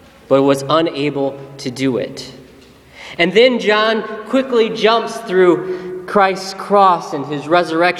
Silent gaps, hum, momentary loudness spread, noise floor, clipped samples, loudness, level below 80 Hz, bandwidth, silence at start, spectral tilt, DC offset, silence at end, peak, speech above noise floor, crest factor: none; none; 14 LU; -43 dBFS; under 0.1%; -15 LUFS; -56 dBFS; 13.5 kHz; 0.3 s; -5 dB/octave; under 0.1%; 0 s; 0 dBFS; 28 dB; 16 dB